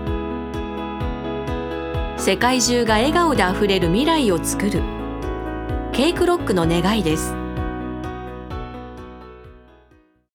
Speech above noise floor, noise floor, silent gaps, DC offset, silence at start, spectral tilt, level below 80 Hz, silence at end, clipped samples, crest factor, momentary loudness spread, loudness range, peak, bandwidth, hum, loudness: 38 dB; -55 dBFS; none; under 0.1%; 0 s; -4.5 dB/octave; -32 dBFS; 0.75 s; under 0.1%; 18 dB; 15 LU; 6 LU; -2 dBFS; 19 kHz; none; -21 LUFS